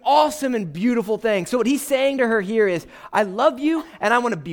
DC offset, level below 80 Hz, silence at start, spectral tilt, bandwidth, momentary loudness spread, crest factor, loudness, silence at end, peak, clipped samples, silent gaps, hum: under 0.1%; -60 dBFS; 0.05 s; -4.5 dB/octave; 20 kHz; 5 LU; 16 dB; -20 LUFS; 0 s; -4 dBFS; under 0.1%; none; none